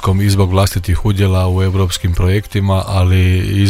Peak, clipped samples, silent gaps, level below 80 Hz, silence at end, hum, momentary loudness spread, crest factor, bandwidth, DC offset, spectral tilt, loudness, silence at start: 0 dBFS; under 0.1%; none; -26 dBFS; 0 s; none; 3 LU; 12 dB; 15 kHz; under 0.1%; -6 dB/octave; -14 LUFS; 0 s